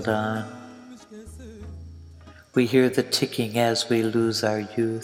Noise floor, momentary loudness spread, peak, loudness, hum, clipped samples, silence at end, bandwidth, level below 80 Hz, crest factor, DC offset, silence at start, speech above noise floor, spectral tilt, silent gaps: -47 dBFS; 23 LU; -6 dBFS; -23 LUFS; none; under 0.1%; 0 s; 17 kHz; -52 dBFS; 18 dB; under 0.1%; 0 s; 24 dB; -5 dB/octave; none